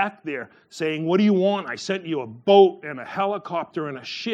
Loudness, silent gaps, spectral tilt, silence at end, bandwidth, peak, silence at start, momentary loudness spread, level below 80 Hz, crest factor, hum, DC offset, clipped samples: -22 LUFS; none; -6 dB/octave; 0 s; 8.8 kHz; -2 dBFS; 0 s; 16 LU; -76 dBFS; 20 dB; none; under 0.1%; under 0.1%